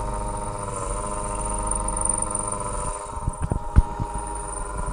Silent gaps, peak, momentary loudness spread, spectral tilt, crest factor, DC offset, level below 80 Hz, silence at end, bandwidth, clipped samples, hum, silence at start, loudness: none; 0 dBFS; 8 LU; -5 dB/octave; 24 dB; under 0.1%; -30 dBFS; 0 s; 11 kHz; under 0.1%; none; 0 s; -27 LUFS